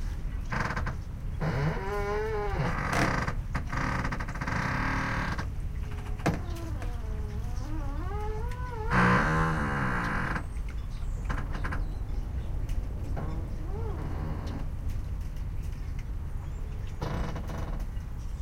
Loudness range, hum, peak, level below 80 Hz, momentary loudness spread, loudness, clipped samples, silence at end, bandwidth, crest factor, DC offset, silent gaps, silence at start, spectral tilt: 8 LU; none; -12 dBFS; -34 dBFS; 10 LU; -33 LUFS; under 0.1%; 0 s; 15.5 kHz; 18 dB; under 0.1%; none; 0 s; -6.5 dB/octave